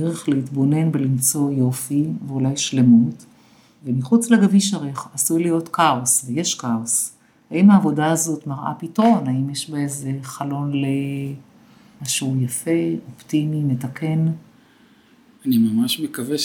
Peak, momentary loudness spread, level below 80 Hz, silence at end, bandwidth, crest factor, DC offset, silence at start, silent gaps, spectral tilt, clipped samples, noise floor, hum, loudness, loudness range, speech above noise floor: -4 dBFS; 12 LU; -66 dBFS; 0 s; 18 kHz; 16 dB; under 0.1%; 0 s; none; -5 dB/octave; under 0.1%; -53 dBFS; none; -20 LUFS; 6 LU; 34 dB